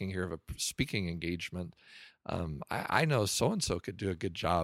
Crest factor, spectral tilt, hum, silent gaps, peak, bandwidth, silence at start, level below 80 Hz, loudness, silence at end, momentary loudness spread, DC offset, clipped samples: 24 dB; -4.5 dB/octave; none; none; -10 dBFS; 16 kHz; 0 s; -54 dBFS; -34 LUFS; 0 s; 13 LU; under 0.1%; under 0.1%